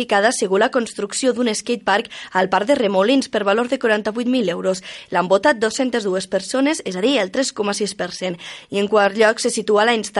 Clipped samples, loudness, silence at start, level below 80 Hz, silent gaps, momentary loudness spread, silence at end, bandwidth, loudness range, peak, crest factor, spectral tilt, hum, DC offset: under 0.1%; -19 LUFS; 0 s; -62 dBFS; none; 7 LU; 0 s; 11.5 kHz; 2 LU; -4 dBFS; 14 dB; -3.5 dB/octave; none; under 0.1%